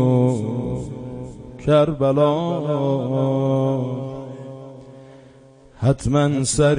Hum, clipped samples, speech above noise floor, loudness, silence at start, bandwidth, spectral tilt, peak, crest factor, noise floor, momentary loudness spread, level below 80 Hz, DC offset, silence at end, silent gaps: none; under 0.1%; 29 dB; -20 LUFS; 0 s; 10.5 kHz; -6.5 dB/octave; -4 dBFS; 18 dB; -47 dBFS; 18 LU; -44 dBFS; under 0.1%; 0 s; none